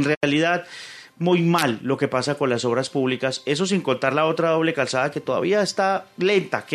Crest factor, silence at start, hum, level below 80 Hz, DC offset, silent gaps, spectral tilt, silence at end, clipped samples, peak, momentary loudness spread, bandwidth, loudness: 18 dB; 0 s; none; -66 dBFS; under 0.1%; 0.17-0.21 s; -5 dB/octave; 0 s; under 0.1%; -4 dBFS; 4 LU; 13.5 kHz; -22 LUFS